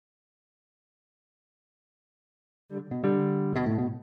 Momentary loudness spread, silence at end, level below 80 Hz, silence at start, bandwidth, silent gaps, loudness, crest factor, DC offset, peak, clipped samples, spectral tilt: 14 LU; 0 s; -64 dBFS; 2.7 s; 6.4 kHz; none; -28 LUFS; 18 dB; under 0.1%; -14 dBFS; under 0.1%; -10.5 dB/octave